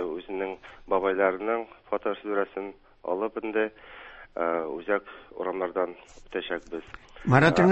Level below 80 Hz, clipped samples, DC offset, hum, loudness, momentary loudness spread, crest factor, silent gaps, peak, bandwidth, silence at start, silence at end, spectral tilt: -58 dBFS; under 0.1%; under 0.1%; none; -28 LUFS; 17 LU; 24 dB; none; -4 dBFS; 8.4 kHz; 0 s; 0 s; -7 dB/octave